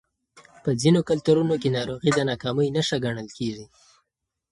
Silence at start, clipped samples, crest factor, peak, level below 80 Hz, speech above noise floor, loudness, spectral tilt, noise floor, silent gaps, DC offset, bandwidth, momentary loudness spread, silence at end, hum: 0.35 s; under 0.1%; 18 dB; -6 dBFS; -58 dBFS; 58 dB; -24 LUFS; -6 dB/octave; -81 dBFS; none; under 0.1%; 11.5 kHz; 11 LU; 0.85 s; none